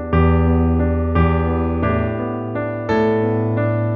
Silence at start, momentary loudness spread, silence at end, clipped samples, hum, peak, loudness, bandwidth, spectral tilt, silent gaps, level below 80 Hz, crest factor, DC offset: 0 s; 8 LU; 0 s; under 0.1%; none; -4 dBFS; -18 LUFS; 4.8 kHz; -10.5 dB/octave; none; -26 dBFS; 14 dB; under 0.1%